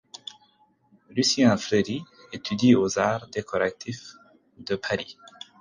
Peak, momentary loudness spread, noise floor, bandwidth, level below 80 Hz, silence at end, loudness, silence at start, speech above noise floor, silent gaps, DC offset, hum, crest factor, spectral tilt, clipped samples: -6 dBFS; 21 LU; -63 dBFS; 9.8 kHz; -60 dBFS; 0.5 s; -24 LUFS; 1.15 s; 38 dB; none; under 0.1%; none; 20 dB; -4.5 dB/octave; under 0.1%